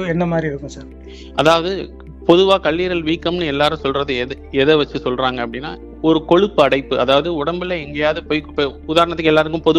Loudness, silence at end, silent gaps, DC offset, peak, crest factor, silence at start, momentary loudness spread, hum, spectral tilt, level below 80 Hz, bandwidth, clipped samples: -17 LUFS; 0 s; none; under 0.1%; 0 dBFS; 16 dB; 0 s; 12 LU; none; -6 dB/octave; -38 dBFS; 11.5 kHz; under 0.1%